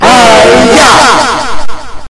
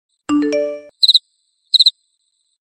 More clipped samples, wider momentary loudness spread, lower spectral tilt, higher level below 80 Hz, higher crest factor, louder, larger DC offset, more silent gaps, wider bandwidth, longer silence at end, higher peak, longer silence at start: first, 10% vs under 0.1%; first, 16 LU vs 10 LU; about the same, -2.5 dB/octave vs -2 dB/octave; first, -26 dBFS vs -60 dBFS; second, 4 dB vs 18 dB; first, -3 LUFS vs -13 LUFS; neither; neither; second, 12 kHz vs 13.5 kHz; second, 0.05 s vs 0.7 s; about the same, 0 dBFS vs 0 dBFS; second, 0 s vs 0.3 s